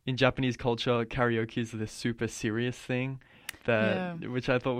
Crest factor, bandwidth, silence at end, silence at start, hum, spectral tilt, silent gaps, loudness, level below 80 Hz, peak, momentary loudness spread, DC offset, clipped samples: 22 dB; 16 kHz; 0 s; 0.05 s; none; -5.5 dB/octave; none; -30 LUFS; -54 dBFS; -8 dBFS; 8 LU; under 0.1%; under 0.1%